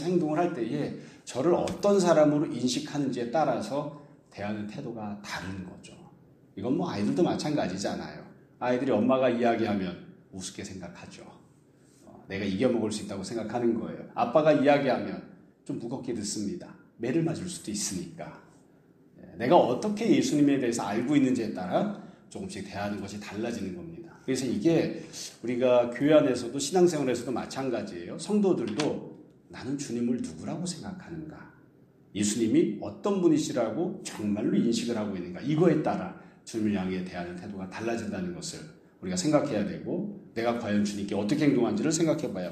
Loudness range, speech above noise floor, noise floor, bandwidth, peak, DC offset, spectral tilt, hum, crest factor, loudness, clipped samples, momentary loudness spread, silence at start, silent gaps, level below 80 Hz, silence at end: 8 LU; 31 dB; -59 dBFS; 14 kHz; -6 dBFS; under 0.1%; -5.5 dB/octave; none; 22 dB; -28 LUFS; under 0.1%; 17 LU; 0 s; none; -66 dBFS; 0 s